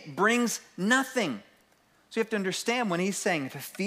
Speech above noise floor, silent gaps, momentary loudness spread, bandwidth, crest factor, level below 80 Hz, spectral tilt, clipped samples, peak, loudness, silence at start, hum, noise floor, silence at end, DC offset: 36 dB; none; 8 LU; 16 kHz; 20 dB; -80 dBFS; -3.5 dB/octave; under 0.1%; -10 dBFS; -28 LUFS; 0 s; none; -65 dBFS; 0 s; under 0.1%